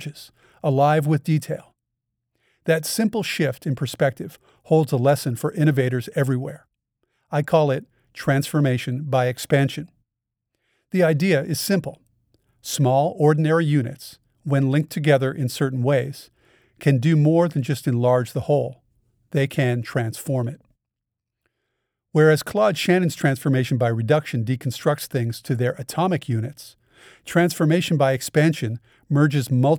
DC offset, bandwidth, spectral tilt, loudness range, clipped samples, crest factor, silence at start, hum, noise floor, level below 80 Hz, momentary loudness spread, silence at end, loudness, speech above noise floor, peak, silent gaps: under 0.1%; 20 kHz; -6.5 dB/octave; 3 LU; under 0.1%; 18 dB; 0 s; none; -84 dBFS; -62 dBFS; 10 LU; 0 s; -21 LUFS; 63 dB; -4 dBFS; none